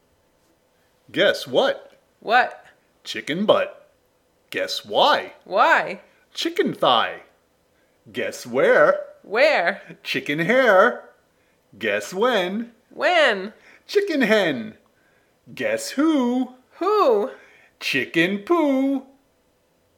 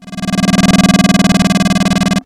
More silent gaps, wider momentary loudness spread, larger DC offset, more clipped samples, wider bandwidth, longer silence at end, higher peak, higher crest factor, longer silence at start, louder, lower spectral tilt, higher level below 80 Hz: neither; first, 14 LU vs 4 LU; neither; neither; first, 17.5 kHz vs 14.5 kHz; first, 0.95 s vs 0.05 s; about the same, -2 dBFS vs 0 dBFS; first, 20 dB vs 10 dB; first, 1.15 s vs 0 s; second, -21 LUFS vs -11 LUFS; about the same, -4 dB/octave vs -5 dB/octave; second, -76 dBFS vs -32 dBFS